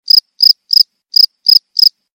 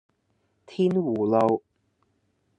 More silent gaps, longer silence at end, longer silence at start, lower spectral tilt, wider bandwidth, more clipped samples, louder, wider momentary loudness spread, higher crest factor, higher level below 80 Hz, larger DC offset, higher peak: neither; second, 0.25 s vs 1 s; second, 0.15 s vs 0.7 s; second, 3 dB/octave vs -9 dB/octave; first, over 20 kHz vs 8.8 kHz; first, 4% vs under 0.1%; first, -8 LUFS vs -24 LUFS; second, 3 LU vs 8 LU; second, 12 dB vs 18 dB; first, -66 dBFS vs -72 dBFS; neither; first, 0 dBFS vs -8 dBFS